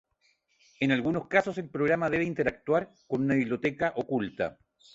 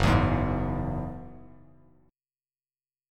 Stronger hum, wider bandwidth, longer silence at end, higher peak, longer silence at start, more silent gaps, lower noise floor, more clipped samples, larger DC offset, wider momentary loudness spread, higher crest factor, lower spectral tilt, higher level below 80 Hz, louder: neither; second, 7.8 kHz vs 13 kHz; second, 0.4 s vs 1.65 s; about the same, -8 dBFS vs -8 dBFS; first, 0.8 s vs 0 s; neither; second, -71 dBFS vs under -90 dBFS; neither; neither; second, 7 LU vs 19 LU; about the same, 20 dB vs 22 dB; about the same, -7 dB/octave vs -7 dB/octave; second, -60 dBFS vs -38 dBFS; about the same, -29 LUFS vs -28 LUFS